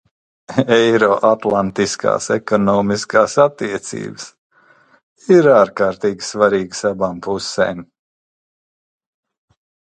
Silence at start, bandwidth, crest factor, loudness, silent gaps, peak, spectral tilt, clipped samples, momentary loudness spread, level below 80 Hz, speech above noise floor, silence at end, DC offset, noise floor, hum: 0.5 s; 9.4 kHz; 18 dB; -16 LUFS; 4.38-4.50 s, 5.03-5.16 s; 0 dBFS; -5 dB/octave; under 0.1%; 13 LU; -54 dBFS; 37 dB; 2.1 s; under 0.1%; -52 dBFS; none